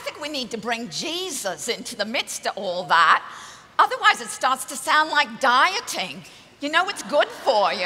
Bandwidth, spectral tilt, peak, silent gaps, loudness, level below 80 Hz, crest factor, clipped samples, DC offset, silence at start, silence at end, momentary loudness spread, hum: 16 kHz; -1.5 dB/octave; -2 dBFS; none; -22 LUFS; -68 dBFS; 20 dB; under 0.1%; under 0.1%; 0 s; 0 s; 11 LU; none